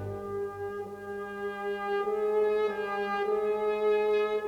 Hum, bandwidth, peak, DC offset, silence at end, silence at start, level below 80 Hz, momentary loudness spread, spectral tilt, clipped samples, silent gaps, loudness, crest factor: 50 Hz at -60 dBFS; 7.2 kHz; -18 dBFS; under 0.1%; 0 s; 0 s; -64 dBFS; 10 LU; -6 dB/octave; under 0.1%; none; -30 LUFS; 12 dB